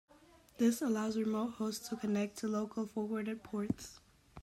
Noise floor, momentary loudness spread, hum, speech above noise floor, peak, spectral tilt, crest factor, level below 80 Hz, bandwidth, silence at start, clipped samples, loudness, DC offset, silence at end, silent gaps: -63 dBFS; 7 LU; none; 27 dB; -20 dBFS; -5.5 dB/octave; 18 dB; -68 dBFS; 15.5 kHz; 0.6 s; under 0.1%; -37 LUFS; under 0.1%; 0 s; none